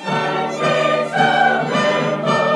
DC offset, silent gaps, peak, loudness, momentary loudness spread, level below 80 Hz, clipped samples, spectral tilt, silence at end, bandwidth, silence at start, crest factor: under 0.1%; none; -2 dBFS; -17 LUFS; 5 LU; -74 dBFS; under 0.1%; -5 dB/octave; 0 s; 11.5 kHz; 0 s; 14 dB